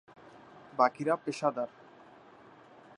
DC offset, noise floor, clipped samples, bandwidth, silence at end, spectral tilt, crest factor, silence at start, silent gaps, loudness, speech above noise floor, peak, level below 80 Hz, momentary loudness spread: under 0.1%; -56 dBFS; under 0.1%; 11 kHz; 1.3 s; -5.5 dB/octave; 24 dB; 0.35 s; none; -31 LUFS; 26 dB; -10 dBFS; -82 dBFS; 21 LU